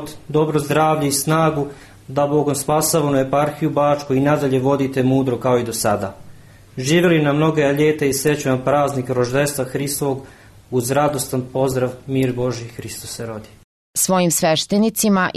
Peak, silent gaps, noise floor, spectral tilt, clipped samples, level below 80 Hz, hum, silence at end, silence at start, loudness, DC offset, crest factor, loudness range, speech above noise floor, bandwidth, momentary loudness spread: -6 dBFS; 13.64-13.94 s; -42 dBFS; -5 dB/octave; under 0.1%; -50 dBFS; none; 0.05 s; 0 s; -18 LUFS; under 0.1%; 14 dB; 4 LU; 24 dB; 13.5 kHz; 10 LU